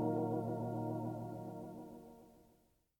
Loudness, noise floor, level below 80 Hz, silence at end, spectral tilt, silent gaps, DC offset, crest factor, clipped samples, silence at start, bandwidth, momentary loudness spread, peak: -42 LUFS; -73 dBFS; -72 dBFS; 0.6 s; -10 dB/octave; none; under 0.1%; 16 dB; under 0.1%; 0 s; 18.5 kHz; 18 LU; -26 dBFS